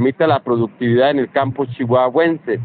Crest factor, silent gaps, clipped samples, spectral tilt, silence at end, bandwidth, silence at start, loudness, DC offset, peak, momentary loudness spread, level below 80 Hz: 14 dB; none; under 0.1%; -5.5 dB/octave; 0 s; 4.6 kHz; 0 s; -16 LUFS; under 0.1%; -2 dBFS; 5 LU; -58 dBFS